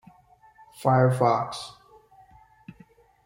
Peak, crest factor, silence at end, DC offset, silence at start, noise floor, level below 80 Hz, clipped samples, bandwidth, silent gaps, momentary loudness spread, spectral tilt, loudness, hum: -8 dBFS; 20 dB; 1.55 s; under 0.1%; 0.8 s; -57 dBFS; -64 dBFS; under 0.1%; 16 kHz; none; 17 LU; -7 dB/octave; -23 LUFS; none